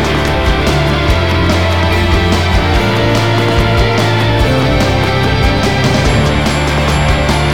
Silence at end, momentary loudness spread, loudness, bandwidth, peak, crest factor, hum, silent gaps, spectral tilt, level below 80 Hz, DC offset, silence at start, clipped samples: 0 s; 1 LU; -12 LUFS; 17.5 kHz; 0 dBFS; 10 dB; none; none; -5.5 dB/octave; -18 dBFS; 3%; 0 s; under 0.1%